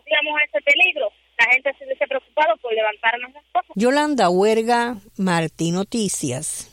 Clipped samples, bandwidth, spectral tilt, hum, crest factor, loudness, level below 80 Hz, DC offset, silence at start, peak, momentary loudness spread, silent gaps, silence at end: under 0.1%; 16.5 kHz; -3.5 dB/octave; none; 14 dB; -19 LUFS; -60 dBFS; under 0.1%; 0.05 s; -6 dBFS; 10 LU; none; 0.1 s